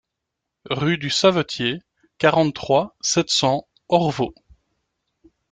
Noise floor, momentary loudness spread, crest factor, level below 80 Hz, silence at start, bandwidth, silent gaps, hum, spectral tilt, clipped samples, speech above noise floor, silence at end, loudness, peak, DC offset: -81 dBFS; 9 LU; 20 dB; -56 dBFS; 0.65 s; 9.6 kHz; none; none; -4 dB/octave; under 0.1%; 62 dB; 1.2 s; -20 LUFS; -2 dBFS; under 0.1%